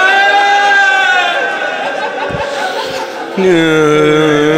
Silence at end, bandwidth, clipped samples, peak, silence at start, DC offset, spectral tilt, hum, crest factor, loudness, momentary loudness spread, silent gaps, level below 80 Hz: 0 s; 15.5 kHz; under 0.1%; 0 dBFS; 0 s; under 0.1%; -4 dB/octave; none; 10 dB; -11 LUFS; 10 LU; none; -46 dBFS